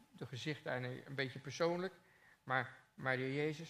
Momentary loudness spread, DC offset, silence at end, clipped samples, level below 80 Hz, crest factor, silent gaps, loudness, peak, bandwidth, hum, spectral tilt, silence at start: 9 LU; under 0.1%; 0 s; under 0.1%; -84 dBFS; 22 dB; none; -41 LUFS; -20 dBFS; 15 kHz; none; -5.5 dB/octave; 0 s